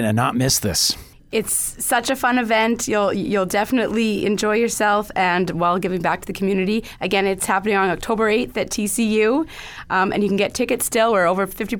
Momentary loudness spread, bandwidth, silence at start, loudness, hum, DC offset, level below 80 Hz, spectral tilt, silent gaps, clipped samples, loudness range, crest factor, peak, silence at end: 5 LU; over 20 kHz; 0 s; -19 LUFS; none; under 0.1%; -46 dBFS; -3.5 dB/octave; none; under 0.1%; 1 LU; 14 dB; -4 dBFS; 0 s